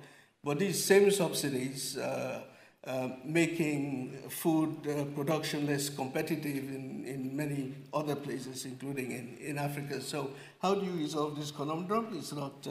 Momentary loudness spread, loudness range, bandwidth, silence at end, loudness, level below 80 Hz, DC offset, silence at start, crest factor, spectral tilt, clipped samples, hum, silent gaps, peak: 10 LU; 6 LU; 16 kHz; 0 s; -34 LUFS; -78 dBFS; under 0.1%; 0 s; 22 dB; -5 dB/octave; under 0.1%; none; none; -12 dBFS